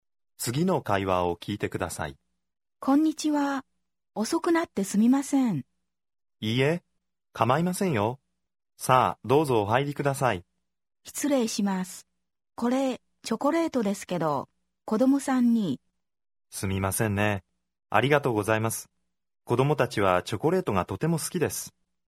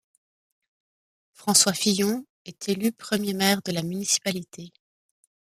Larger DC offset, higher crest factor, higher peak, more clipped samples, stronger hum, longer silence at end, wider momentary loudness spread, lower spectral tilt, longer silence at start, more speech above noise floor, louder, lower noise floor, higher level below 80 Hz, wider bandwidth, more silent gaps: neither; about the same, 22 dB vs 24 dB; about the same, -4 dBFS vs -4 dBFS; neither; neither; second, 0.4 s vs 0.9 s; second, 12 LU vs 16 LU; first, -5.5 dB/octave vs -3 dB/octave; second, 0.4 s vs 1.4 s; second, 54 dB vs over 65 dB; about the same, -26 LUFS vs -24 LUFS; second, -80 dBFS vs under -90 dBFS; first, -60 dBFS vs -68 dBFS; about the same, 16.5 kHz vs 15 kHz; second, none vs 2.30-2.45 s